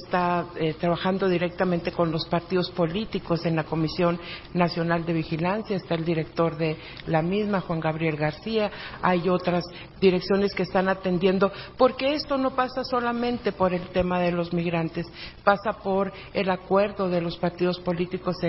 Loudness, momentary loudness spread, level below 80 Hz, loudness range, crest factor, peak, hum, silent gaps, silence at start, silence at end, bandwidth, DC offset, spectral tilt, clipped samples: -25 LUFS; 5 LU; -50 dBFS; 2 LU; 22 dB; -4 dBFS; none; none; 0 s; 0 s; 5.8 kHz; under 0.1%; -10.5 dB/octave; under 0.1%